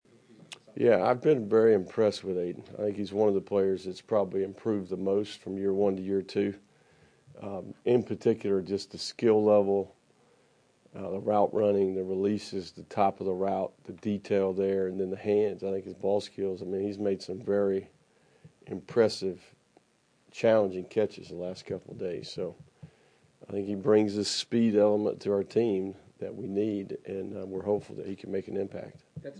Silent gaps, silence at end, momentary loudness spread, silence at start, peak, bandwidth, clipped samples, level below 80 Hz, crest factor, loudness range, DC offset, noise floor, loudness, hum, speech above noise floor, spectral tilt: none; 0 s; 14 LU; 0.7 s; -10 dBFS; 10.5 kHz; under 0.1%; -74 dBFS; 18 dB; 5 LU; under 0.1%; -68 dBFS; -29 LUFS; none; 40 dB; -6 dB/octave